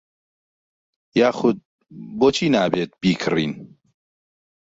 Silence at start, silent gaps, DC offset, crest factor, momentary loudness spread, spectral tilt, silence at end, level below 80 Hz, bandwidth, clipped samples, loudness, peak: 1.15 s; 1.65-1.79 s; under 0.1%; 20 dB; 15 LU; -5.5 dB/octave; 1.1 s; -56 dBFS; 8 kHz; under 0.1%; -20 LUFS; -2 dBFS